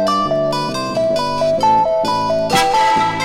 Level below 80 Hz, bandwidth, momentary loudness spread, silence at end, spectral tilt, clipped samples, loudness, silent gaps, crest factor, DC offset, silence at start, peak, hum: -44 dBFS; 17 kHz; 5 LU; 0 s; -4 dB/octave; under 0.1%; -15 LUFS; none; 14 dB; under 0.1%; 0 s; -2 dBFS; none